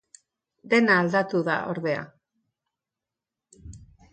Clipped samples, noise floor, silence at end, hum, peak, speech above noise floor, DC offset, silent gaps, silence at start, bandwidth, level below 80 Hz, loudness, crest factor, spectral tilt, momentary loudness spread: under 0.1%; -88 dBFS; 0.3 s; none; -6 dBFS; 65 dB; under 0.1%; none; 0.65 s; 9 kHz; -58 dBFS; -23 LUFS; 20 dB; -6 dB/octave; 11 LU